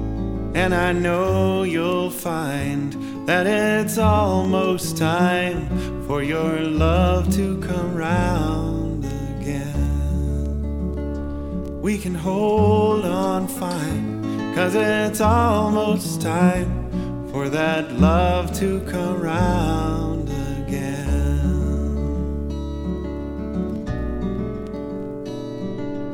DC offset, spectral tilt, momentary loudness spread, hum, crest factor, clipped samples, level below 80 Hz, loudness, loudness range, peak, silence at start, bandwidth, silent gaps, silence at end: under 0.1%; -6.5 dB/octave; 10 LU; none; 18 dB; under 0.1%; -30 dBFS; -22 LUFS; 5 LU; -2 dBFS; 0 s; 18 kHz; none; 0 s